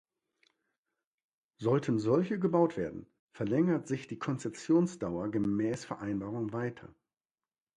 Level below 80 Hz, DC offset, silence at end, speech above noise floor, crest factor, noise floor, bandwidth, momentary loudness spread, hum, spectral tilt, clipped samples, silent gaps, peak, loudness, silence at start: -66 dBFS; under 0.1%; 0.9 s; over 59 dB; 18 dB; under -90 dBFS; 10.5 kHz; 10 LU; none; -7.5 dB/octave; under 0.1%; 3.19-3.27 s; -14 dBFS; -32 LUFS; 1.6 s